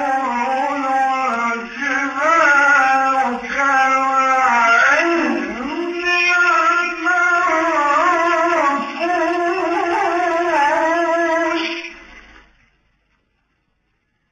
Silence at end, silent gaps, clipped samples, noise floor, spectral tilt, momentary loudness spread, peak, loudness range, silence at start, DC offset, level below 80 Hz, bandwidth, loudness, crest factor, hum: 2.1 s; none; under 0.1%; -67 dBFS; -2.5 dB/octave; 8 LU; -2 dBFS; 6 LU; 0 s; under 0.1%; -56 dBFS; 9.4 kHz; -16 LUFS; 14 dB; none